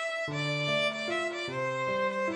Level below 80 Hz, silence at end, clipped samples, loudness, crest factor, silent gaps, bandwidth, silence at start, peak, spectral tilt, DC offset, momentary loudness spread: -70 dBFS; 0 s; under 0.1%; -30 LUFS; 12 dB; none; 10.5 kHz; 0 s; -18 dBFS; -4.5 dB/octave; under 0.1%; 4 LU